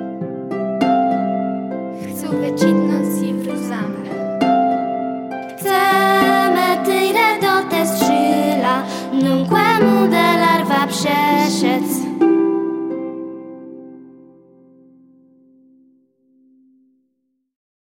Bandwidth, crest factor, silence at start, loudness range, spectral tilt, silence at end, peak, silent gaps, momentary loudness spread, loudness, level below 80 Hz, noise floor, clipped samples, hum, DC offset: 17 kHz; 16 dB; 0 s; 7 LU; -5 dB/octave; 3.8 s; -2 dBFS; none; 13 LU; -17 LUFS; -62 dBFS; -70 dBFS; under 0.1%; none; under 0.1%